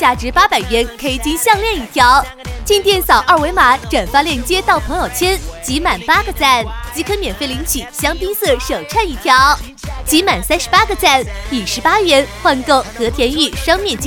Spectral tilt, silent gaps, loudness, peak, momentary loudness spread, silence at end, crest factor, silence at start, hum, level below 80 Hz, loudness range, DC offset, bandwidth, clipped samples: -3 dB/octave; none; -13 LUFS; 0 dBFS; 9 LU; 0 s; 14 dB; 0 s; none; -28 dBFS; 3 LU; under 0.1%; over 20 kHz; 0.1%